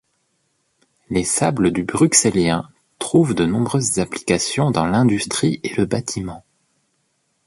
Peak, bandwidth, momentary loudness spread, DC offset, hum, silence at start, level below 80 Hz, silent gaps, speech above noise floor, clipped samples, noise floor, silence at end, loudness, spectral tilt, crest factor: 0 dBFS; 11.5 kHz; 10 LU; under 0.1%; none; 1.1 s; -46 dBFS; none; 50 dB; under 0.1%; -68 dBFS; 1.05 s; -18 LUFS; -4.5 dB/octave; 20 dB